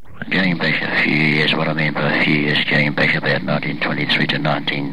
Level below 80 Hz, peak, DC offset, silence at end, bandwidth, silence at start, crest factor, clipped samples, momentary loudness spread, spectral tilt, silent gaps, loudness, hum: -54 dBFS; -4 dBFS; 3%; 0 s; 11 kHz; 0.1 s; 14 dB; under 0.1%; 5 LU; -6.5 dB/octave; none; -17 LUFS; none